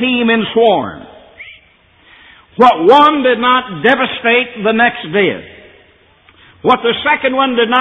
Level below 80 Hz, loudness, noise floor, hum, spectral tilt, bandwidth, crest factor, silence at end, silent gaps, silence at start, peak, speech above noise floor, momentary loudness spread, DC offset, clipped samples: -52 dBFS; -11 LUFS; -49 dBFS; none; -6 dB/octave; 7.8 kHz; 14 dB; 0 s; none; 0 s; 0 dBFS; 37 dB; 9 LU; under 0.1%; under 0.1%